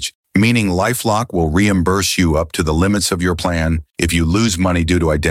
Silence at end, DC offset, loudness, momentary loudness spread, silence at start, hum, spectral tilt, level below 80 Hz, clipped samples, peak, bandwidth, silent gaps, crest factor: 0 s; under 0.1%; -16 LUFS; 4 LU; 0 s; none; -5 dB/octave; -28 dBFS; under 0.1%; -2 dBFS; 16.5 kHz; 0.15-0.23 s; 12 dB